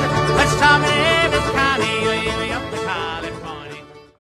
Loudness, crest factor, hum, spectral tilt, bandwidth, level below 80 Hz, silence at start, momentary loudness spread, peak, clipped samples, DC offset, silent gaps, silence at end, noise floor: -17 LUFS; 18 dB; none; -4 dB/octave; 14 kHz; -36 dBFS; 0 s; 18 LU; -2 dBFS; under 0.1%; under 0.1%; none; 0.25 s; -38 dBFS